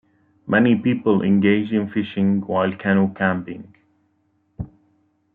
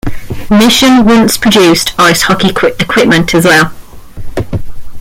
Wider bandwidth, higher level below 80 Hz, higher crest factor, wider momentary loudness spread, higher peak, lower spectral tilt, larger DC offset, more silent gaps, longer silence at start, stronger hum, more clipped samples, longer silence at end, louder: second, 3.9 kHz vs 17 kHz; second, -54 dBFS vs -28 dBFS; first, 18 dB vs 8 dB; first, 19 LU vs 15 LU; about the same, -2 dBFS vs 0 dBFS; first, -11 dB/octave vs -4 dB/octave; neither; neither; first, 0.45 s vs 0.05 s; neither; neither; first, 0.7 s vs 0 s; second, -19 LUFS vs -7 LUFS